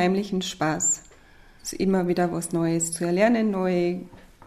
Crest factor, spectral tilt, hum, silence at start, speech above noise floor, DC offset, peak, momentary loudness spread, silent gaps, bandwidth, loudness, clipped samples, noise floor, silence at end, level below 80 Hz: 16 dB; -4.5 dB/octave; none; 0 s; 27 dB; under 0.1%; -8 dBFS; 7 LU; none; 14 kHz; -24 LUFS; under 0.1%; -51 dBFS; 0.3 s; -54 dBFS